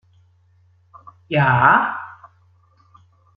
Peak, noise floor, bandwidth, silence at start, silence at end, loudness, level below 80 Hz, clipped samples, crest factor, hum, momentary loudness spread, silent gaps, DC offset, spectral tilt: -2 dBFS; -56 dBFS; 5 kHz; 1.3 s; 1.25 s; -16 LUFS; -58 dBFS; under 0.1%; 20 dB; none; 19 LU; none; under 0.1%; -9 dB/octave